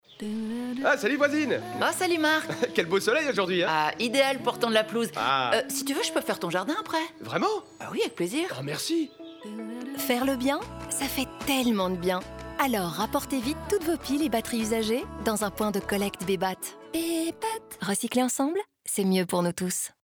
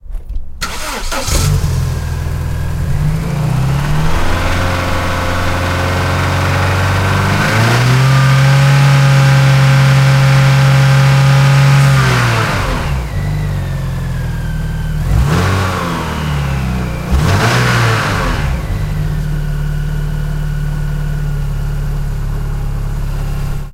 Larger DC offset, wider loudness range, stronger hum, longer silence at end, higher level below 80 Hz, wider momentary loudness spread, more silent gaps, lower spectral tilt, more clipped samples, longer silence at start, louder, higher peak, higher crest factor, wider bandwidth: neither; second, 5 LU vs 10 LU; neither; first, 0.15 s vs 0 s; second, -54 dBFS vs -20 dBFS; second, 8 LU vs 11 LU; neither; second, -3.5 dB/octave vs -5.5 dB/octave; neither; about the same, 0.1 s vs 0.05 s; second, -27 LUFS vs -13 LUFS; second, -8 dBFS vs 0 dBFS; first, 18 dB vs 12 dB; first, over 20 kHz vs 16 kHz